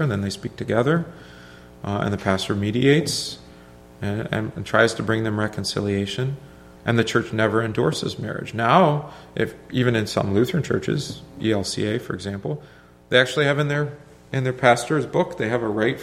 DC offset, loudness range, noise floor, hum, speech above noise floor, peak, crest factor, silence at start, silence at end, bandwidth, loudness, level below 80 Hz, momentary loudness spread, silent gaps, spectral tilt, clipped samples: under 0.1%; 2 LU; -46 dBFS; none; 24 dB; 0 dBFS; 22 dB; 0 s; 0 s; 15.5 kHz; -22 LUFS; -52 dBFS; 12 LU; none; -5.5 dB/octave; under 0.1%